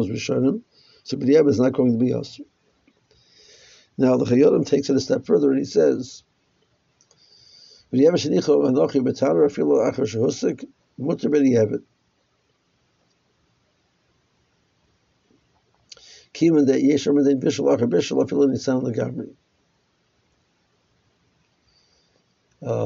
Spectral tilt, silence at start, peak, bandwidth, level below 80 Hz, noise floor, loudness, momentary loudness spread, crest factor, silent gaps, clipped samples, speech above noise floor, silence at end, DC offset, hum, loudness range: -7 dB/octave; 0 s; -6 dBFS; 7.6 kHz; -64 dBFS; -67 dBFS; -20 LUFS; 15 LU; 16 dB; none; under 0.1%; 48 dB; 0 s; under 0.1%; none; 6 LU